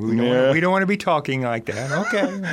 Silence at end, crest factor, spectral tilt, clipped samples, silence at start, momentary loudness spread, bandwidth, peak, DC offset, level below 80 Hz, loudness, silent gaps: 0 s; 14 dB; -6 dB/octave; under 0.1%; 0 s; 7 LU; 14.5 kHz; -6 dBFS; under 0.1%; -62 dBFS; -20 LUFS; none